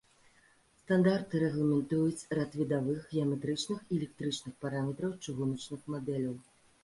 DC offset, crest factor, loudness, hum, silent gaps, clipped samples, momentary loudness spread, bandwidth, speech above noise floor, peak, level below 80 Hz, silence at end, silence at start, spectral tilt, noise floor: under 0.1%; 18 dB; -33 LUFS; none; none; under 0.1%; 9 LU; 11.5 kHz; 33 dB; -16 dBFS; -68 dBFS; 0.4 s; 0.9 s; -6.5 dB/octave; -66 dBFS